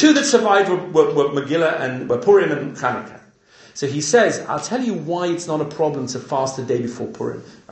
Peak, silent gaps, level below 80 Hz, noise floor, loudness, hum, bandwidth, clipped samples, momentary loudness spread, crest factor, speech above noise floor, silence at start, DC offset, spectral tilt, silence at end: 0 dBFS; none; -64 dBFS; -49 dBFS; -19 LUFS; none; 8.8 kHz; under 0.1%; 12 LU; 18 dB; 31 dB; 0 s; under 0.1%; -4.5 dB/octave; 0.15 s